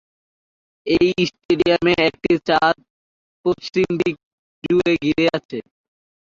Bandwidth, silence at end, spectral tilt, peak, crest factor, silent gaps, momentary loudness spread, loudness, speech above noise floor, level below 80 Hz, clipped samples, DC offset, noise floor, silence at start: 7.4 kHz; 0.7 s; -6 dB/octave; -4 dBFS; 16 dB; 1.45-1.49 s, 2.90-3.44 s, 4.23-4.62 s, 5.45-5.49 s; 13 LU; -19 LUFS; over 72 dB; -50 dBFS; under 0.1%; under 0.1%; under -90 dBFS; 0.85 s